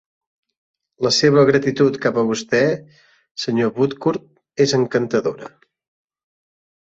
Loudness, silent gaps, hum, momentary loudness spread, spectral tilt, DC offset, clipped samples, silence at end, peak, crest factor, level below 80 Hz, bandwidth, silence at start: -18 LUFS; 3.31-3.35 s; none; 14 LU; -5 dB/octave; under 0.1%; under 0.1%; 1.4 s; -2 dBFS; 18 dB; -60 dBFS; 8 kHz; 1 s